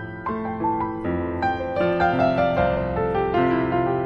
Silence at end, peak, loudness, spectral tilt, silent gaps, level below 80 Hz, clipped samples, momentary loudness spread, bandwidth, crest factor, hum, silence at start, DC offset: 0 s; -8 dBFS; -23 LUFS; -9 dB/octave; none; -40 dBFS; under 0.1%; 6 LU; 6.6 kHz; 14 dB; none; 0 s; under 0.1%